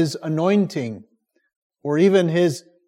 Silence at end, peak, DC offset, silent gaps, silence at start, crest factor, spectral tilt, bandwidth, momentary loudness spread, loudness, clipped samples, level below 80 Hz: 0.3 s; -6 dBFS; under 0.1%; 1.56-1.70 s; 0 s; 16 dB; -6.5 dB/octave; 15.5 kHz; 16 LU; -20 LUFS; under 0.1%; -70 dBFS